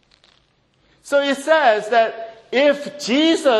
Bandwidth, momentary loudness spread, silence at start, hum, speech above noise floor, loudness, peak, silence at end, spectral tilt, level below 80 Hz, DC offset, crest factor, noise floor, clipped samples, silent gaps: 12.5 kHz; 8 LU; 1.05 s; none; 44 dB; -17 LUFS; -2 dBFS; 0 s; -3 dB/octave; -66 dBFS; under 0.1%; 16 dB; -61 dBFS; under 0.1%; none